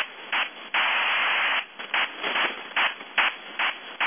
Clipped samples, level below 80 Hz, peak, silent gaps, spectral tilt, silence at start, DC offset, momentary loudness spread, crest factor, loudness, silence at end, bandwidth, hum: under 0.1%; -76 dBFS; -10 dBFS; none; 4 dB/octave; 0 s; under 0.1%; 5 LU; 16 dB; -24 LUFS; 0 s; 3.7 kHz; none